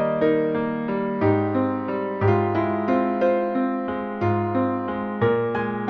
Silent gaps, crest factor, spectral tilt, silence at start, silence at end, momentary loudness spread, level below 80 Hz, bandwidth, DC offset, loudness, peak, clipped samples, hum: none; 14 dB; -10 dB/octave; 0 s; 0 s; 5 LU; -56 dBFS; 6.2 kHz; under 0.1%; -23 LUFS; -8 dBFS; under 0.1%; none